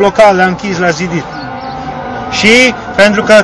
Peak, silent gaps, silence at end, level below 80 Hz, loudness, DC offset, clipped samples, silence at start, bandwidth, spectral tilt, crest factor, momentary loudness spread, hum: 0 dBFS; none; 0 s; -38 dBFS; -8 LUFS; under 0.1%; 5%; 0 s; 11 kHz; -4 dB/octave; 10 dB; 16 LU; none